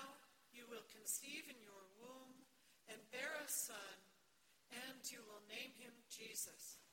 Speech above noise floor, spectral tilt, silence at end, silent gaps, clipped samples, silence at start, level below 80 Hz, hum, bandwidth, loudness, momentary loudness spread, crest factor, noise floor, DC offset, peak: 25 dB; 0 dB/octave; 0 s; none; under 0.1%; 0 s; under -90 dBFS; none; 17 kHz; -50 LUFS; 19 LU; 24 dB; -77 dBFS; under 0.1%; -30 dBFS